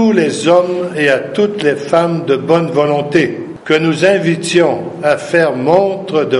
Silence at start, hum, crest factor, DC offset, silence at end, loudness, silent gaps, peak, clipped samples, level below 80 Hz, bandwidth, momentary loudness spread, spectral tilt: 0 s; none; 12 dB; under 0.1%; 0 s; -13 LUFS; none; 0 dBFS; under 0.1%; -56 dBFS; 11.5 kHz; 4 LU; -5.5 dB/octave